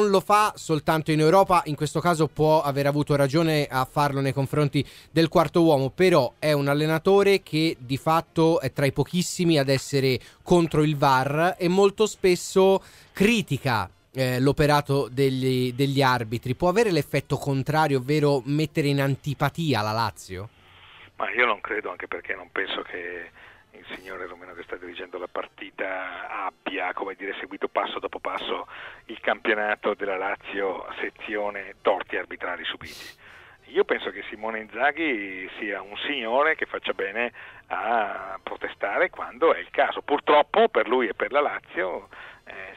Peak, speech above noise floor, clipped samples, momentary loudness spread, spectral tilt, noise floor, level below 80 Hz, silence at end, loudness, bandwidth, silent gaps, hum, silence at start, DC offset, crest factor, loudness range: -4 dBFS; 26 dB; under 0.1%; 14 LU; -5.5 dB/octave; -50 dBFS; -54 dBFS; 0 s; -24 LUFS; 16 kHz; none; none; 0 s; under 0.1%; 20 dB; 9 LU